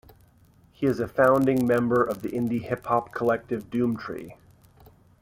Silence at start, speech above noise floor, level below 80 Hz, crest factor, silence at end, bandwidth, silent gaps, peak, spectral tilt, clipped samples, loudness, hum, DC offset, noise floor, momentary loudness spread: 0.8 s; 33 dB; -58 dBFS; 18 dB; 0.9 s; 16.5 kHz; none; -8 dBFS; -8 dB/octave; under 0.1%; -25 LUFS; none; under 0.1%; -58 dBFS; 11 LU